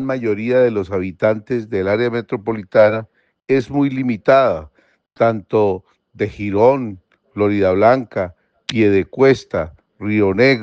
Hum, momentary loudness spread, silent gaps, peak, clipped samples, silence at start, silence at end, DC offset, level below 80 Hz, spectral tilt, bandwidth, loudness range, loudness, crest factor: none; 11 LU; none; 0 dBFS; under 0.1%; 0 s; 0 s; under 0.1%; -52 dBFS; -7.5 dB/octave; 7.8 kHz; 2 LU; -17 LUFS; 16 dB